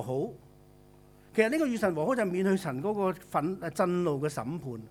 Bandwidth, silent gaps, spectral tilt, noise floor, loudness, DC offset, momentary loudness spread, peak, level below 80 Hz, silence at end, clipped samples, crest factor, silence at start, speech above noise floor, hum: 16.5 kHz; none; -6.5 dB/octave; -56 dBFS; -30 LUFS; under 0.1%; 7 LU; -10 dBFS; -64 dBFS; 0 s; under 0.1%; 20 dB; 0 s; 27 dB; 50 Hz at -60 dBFS